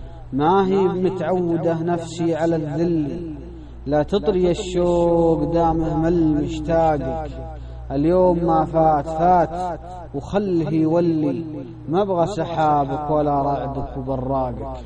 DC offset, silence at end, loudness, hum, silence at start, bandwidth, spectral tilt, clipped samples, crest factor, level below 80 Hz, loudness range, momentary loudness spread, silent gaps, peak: under 0.1%; 0 s; -20 LUFS; none; 0 s; 9.2 kHz; -8 dB/octave; under 0.1%; 14 dB; -36 dBFS; 3 LU; 12 LU; none; -6 dBFS